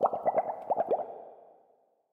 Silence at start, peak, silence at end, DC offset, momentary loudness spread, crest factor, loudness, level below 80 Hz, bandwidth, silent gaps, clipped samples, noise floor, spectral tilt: 0 s; -10 dBFS; 0.65 s; under 0.1%; 17 LU; 22 dB; -32 LUFS; -76 dBFS; 3.8 kHz; none; under 0.1%; -68 dBFS; -8 dB/octave